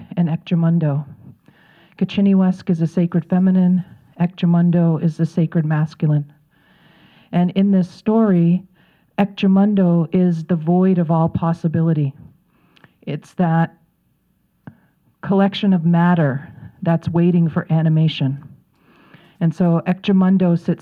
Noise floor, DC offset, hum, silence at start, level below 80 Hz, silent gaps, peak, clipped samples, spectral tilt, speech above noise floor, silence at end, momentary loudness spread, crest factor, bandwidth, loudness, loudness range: -63 dBFS; under 0.1%; none; 0 s; -56 dBFS; none; -2 dBFS; under 0.1%; -9.5 dB/octave; 47 dB; 0.05 s; 9 LU; 16 dB; 5 kHz; -17 LUFS; 4 LU